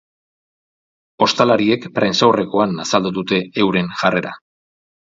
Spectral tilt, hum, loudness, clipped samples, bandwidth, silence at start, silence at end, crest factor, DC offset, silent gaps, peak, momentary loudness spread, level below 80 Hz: -5 dB/octave; none; -17 LUFS; under 0.1%; 7.8 kHz; 1.2 s; 0.7 s; 18 dB; under 0.1%; none; 0 dBFS; 5 LU; -56 dBFS